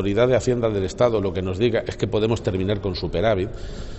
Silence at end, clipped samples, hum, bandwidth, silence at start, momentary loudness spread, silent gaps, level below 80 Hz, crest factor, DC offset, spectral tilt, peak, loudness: 0 s; under 0.1%; none; 8.4 kHz; 0 s; 6 LU; none; -38 dBFS; 16 dB; under 0.1%; -6.5 dB/octave; -6 dBFS; -22 LUFS